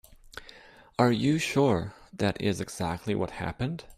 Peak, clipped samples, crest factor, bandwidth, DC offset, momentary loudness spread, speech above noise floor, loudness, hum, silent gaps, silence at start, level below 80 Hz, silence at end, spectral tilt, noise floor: -8 dBFS; under 0.1%; 20 dB; 15.5 kHz; under 0.1%; 20 LU; 25 dB; -28 LUFS; none; none; 0.35 s; -54 dBFS; 0.05 s; -6 dB/octave; -52 dBFS